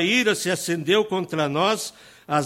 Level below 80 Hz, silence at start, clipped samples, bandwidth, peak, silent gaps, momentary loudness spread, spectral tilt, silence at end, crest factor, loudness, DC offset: -66 dBFS; 0 s; under 0.1%; 16.5 kHz; -6 dBFS; none; 6 LU; -3.5 dB/octave; 0 s; 16 dB; -22 LUFS; under 0.1%